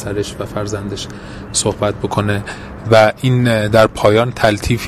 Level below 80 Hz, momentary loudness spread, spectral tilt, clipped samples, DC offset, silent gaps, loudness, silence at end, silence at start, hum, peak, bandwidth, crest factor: -34 dBFS; 14 LU; -5 dB/octave; under 0.1%; under 0.1%; none; -15 LUFS; 0 s; 0 s; none; 0 dBFS; 15 kHz; 16 dB